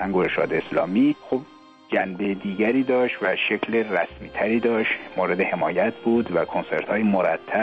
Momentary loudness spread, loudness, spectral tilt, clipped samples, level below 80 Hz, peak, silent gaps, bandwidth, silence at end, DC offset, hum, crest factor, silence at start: 6 LU; -23 LUFS; -8 dB/octave; under 0.1%; -56 dBFS; -10 dBFS; none; 6 kHz; 0 s; under 0.1%; none; 14 dB; 0 s